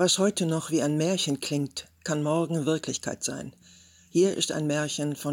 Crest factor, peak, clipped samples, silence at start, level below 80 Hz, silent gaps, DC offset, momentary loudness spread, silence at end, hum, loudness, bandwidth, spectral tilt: 16 dB; -12 dBFS; under 0.1%; 0 s; -68 dBFS; none; under 0.1%; 8 LU; 0 s; none; -27 LUFS; 17 kHz; -4.5 dB/octave